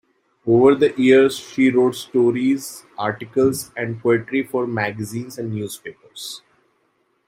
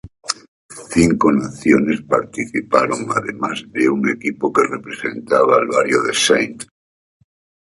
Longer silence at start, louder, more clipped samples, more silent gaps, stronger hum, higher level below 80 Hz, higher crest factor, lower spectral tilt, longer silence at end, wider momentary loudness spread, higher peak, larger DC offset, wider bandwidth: first, 0.45 s vs 0.05 s; about the same, -19 LUFS vs -17 LUFS; neither; second, none vs 0.48-0.69 s; neither; second, -60 dBFS vs -48 dBFS; about the same, 18 dB vs 18 dB; about the same, -5.5 dB/octave vs -4.5 dB/octave; second, 0.9 s vs 1.1 s; first, 18 LU vs 12 LU; about the same, -2 dBFS vs 0 dBFS; neither; first, 16 kHz vs 11.5 kHz